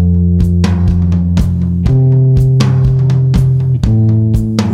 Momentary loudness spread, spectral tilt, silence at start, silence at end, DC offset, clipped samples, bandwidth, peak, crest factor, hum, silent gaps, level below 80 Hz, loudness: 4 LU; -8.5 dB/octave; 0 s; 0 s; under 0.1%; under 0.1%; 8.4 kHz; 0 dBFS; 10 dB; none; none; -20 dBFS; -11 LUFS